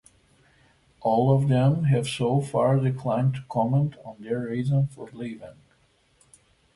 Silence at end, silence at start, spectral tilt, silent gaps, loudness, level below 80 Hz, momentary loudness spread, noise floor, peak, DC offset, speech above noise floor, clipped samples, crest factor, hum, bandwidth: 1.25 s; 1 s; -8 dB/octave; none; -24 LUFS; -58 dBFS; 15 LU; -64 dBFS; -10 dBFS; under 0.1%; 40 dB; under 0.1%; 16 dB; none; 11.5 kHz